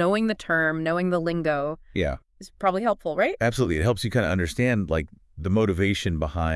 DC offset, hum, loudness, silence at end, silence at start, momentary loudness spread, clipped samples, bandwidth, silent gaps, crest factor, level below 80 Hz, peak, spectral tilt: under 0.1%; none; -25 LUFS; 0 s; 0 s; 5 LU; under 0.1%; 12 kHz; none; 16 dB; -42 dBFS; -8 dBFS; -6.5 dB/octave